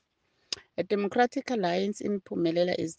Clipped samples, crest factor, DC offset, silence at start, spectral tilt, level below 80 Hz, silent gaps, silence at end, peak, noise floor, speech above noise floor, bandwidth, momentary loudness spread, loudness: under 0.1%; 18 dB; under 0.1%; 0.5 s; -5 dB/octave; -72 dBFS; none; 0.05 s; -12 dBFS; -73 dBFS; 45 dB; 9.8 kHz; 9 LU; -29 LUFS